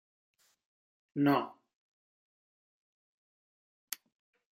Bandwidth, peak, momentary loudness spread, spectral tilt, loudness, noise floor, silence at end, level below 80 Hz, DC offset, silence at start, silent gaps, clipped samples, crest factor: 16 kHz; -16 dBFS; 15 LU; -5.5 dB/octave; -31 LUFS; under -90 dBFS; 3.05 s; -88 dBFS; under 0.1%; 1.15 s; none; under 0.1%; 24 dB